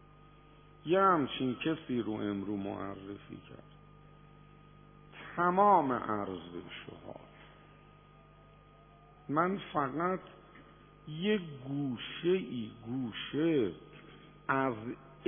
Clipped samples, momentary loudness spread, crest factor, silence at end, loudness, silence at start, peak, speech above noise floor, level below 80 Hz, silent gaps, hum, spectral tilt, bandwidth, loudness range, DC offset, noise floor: under 0.1%; 23 LU; 22 dB; 0 s; -33 LUFS; 0.85 s; -14 dBFS; 25 dB; -66 dBFS; none; 50 Hz at -60 dBFS; -3 dB/octave; 3.6 kHz; 8 LU; under 0.1%; -58 dBFS